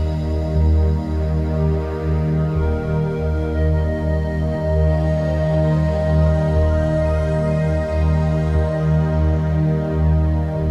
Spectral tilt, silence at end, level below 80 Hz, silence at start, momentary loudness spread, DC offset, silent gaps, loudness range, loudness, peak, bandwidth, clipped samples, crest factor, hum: -9.5 dB/octave; 0 s; -22 dBFS; 0 s; 4 LU; under 0.1%; none; 2 LU; -19 LUFS; -6 dBFS; 6.8 kHz; under 0.1%; 12 dB; none